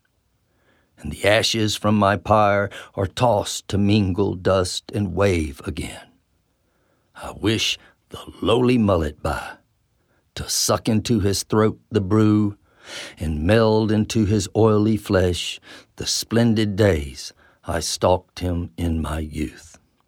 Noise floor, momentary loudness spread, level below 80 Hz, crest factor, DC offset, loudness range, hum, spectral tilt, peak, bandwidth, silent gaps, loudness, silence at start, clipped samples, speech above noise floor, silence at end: -67 dBFS; 17 LU; -40 dBFS; 20 dB; under 0.1%; 5 LU; none; -5 dB/octave; 0 dBFS; 17 kHz; none; -21 LUFS; 1.05 s; under 0.1%; 46 dB; 0.45 s